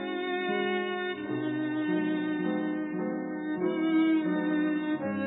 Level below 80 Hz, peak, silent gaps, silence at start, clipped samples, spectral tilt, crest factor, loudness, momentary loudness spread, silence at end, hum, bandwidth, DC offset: -72 dBFS; -18 dBFS; none; 0 s; under 0.1%; -10 dB/octave; 12 dB; -30 LUFS; 7 LU; 0 s; none; 4 kHz; under 0.1%